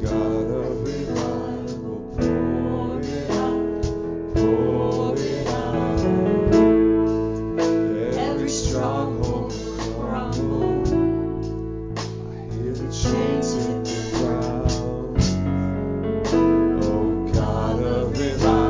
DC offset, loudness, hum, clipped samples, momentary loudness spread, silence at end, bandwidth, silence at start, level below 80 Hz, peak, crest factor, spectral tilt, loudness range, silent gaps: under 0.1%; -23 LUFS; none; under 0.1%; 9 LU; 0 s; 7.6 kHz; 0 s; -34 dBFS; -4 dBFS; 16 dB; -6.5 dB/octave; 5 LU; none